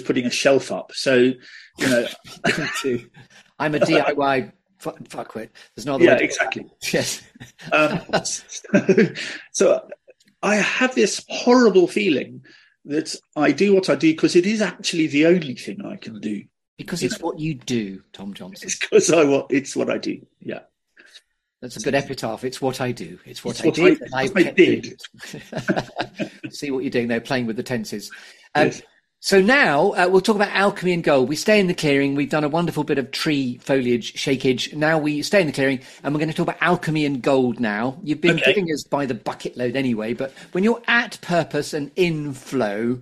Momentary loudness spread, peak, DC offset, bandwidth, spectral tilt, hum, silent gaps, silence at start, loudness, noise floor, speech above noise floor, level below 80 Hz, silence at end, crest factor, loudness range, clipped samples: 16 LU; 0 dBFS; under 0.1%; 14 kHz; -4.5 dB/octave; none; 16.68-16.77 s; 0 s; -20 LUFS; -53 dBFS; 32 dB; -58 dBFS; 0 s; 20 dB; 6 LU; under 0.1%